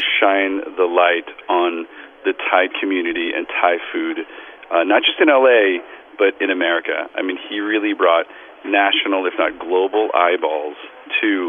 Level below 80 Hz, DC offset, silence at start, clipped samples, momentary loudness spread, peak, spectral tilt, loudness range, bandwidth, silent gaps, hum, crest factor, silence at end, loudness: -64 dBFS; under 0.1%; 0 s; under 0.1%; 11 LU; 0 dBFS; -5.5 dB/octave; 3 LU; 3.8 kHz; none; none; 18 dB; 0 s; -17 LUFS